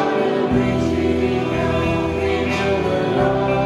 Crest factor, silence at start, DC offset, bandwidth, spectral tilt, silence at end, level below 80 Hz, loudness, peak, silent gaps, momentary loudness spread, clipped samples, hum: 14 dB; 0 s; under 0.1%; 12 kHz; -7 dB/octave; 0 s; -38 dBFS; -19 LUFS; -4 dBFS; none; 2 LU; under 0.1%; none